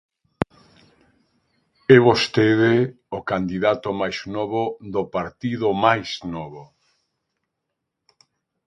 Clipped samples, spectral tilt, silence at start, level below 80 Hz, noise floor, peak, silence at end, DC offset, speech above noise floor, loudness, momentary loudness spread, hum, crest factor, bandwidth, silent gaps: under 0.1%; -6.5 dB/octave; 0.4 s; -54 dBFS; -80 dBFS; 0 dBFS; 2 s; under 0.1%; 60 dB; -21 LUFS; 15 LU; none; 22 dB; 10.5 kHz; none